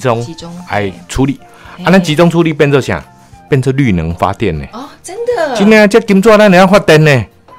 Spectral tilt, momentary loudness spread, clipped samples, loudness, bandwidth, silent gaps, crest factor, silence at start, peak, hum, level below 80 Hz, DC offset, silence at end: -6 dB/octave; 15 LU; 0.8%; -9 LUFS; 16 kHz; none; 10 dB; 0 s; 0 dBFS; none; -34 dBFS; under 0.1%; 0.35 s